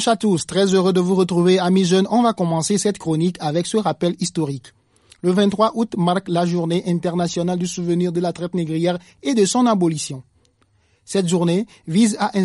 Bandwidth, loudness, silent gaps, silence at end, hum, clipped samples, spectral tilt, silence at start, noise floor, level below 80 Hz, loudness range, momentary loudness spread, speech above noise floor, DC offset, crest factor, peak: 11.5 kHz; -19 LUFS; none; 0 s; none; under 0.1%; -5.5 dB/octave; 0 s; -60 dBFS; -58 dBFS; 4 LU; 7 LU; 42 dB; under 0.1%; 16 dB; -4 dBFS